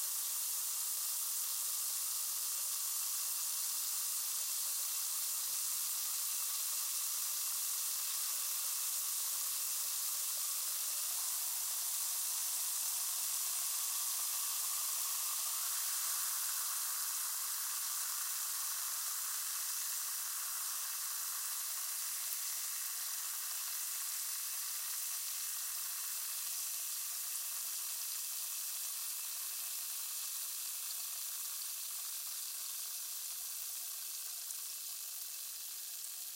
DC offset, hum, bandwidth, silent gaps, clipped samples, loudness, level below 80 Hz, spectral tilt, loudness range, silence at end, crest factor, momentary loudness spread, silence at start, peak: under 0.1%; none; 16 kHz; none; under 0.1%; -36 LUFS; under -90 dBFS; 5.5 dB/octave; 4 LU; 0 s; 20 dB; 5 LU; 0 s; -20 dBFS